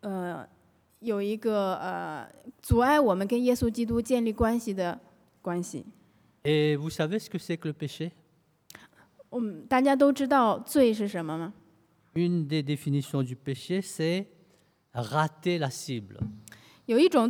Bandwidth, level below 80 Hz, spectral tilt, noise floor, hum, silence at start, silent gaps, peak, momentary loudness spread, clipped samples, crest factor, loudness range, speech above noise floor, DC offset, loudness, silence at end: 19 kHz; -52 dBFS; -6 dB/octave; -67 dBFS; none; 0.05 s; none; -10 dBFS; 15 LU; under 0.1%; 18 dB; 5 LU; 40 dB; under 0.1%; -28 LUFS; 0 s